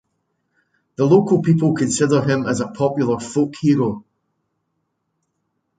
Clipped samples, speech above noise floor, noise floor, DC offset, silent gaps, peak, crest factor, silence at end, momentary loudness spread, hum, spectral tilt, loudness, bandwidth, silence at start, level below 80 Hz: under 0.1%; 56 dB; -73 dBFS; under 0.1%; none; -2 dBFS; 18 dB; 1.8 s; 8 LU; none; -6.5 dB/octave; -18 LUFS; 9.4 kHz; 1 s; -58 dBFS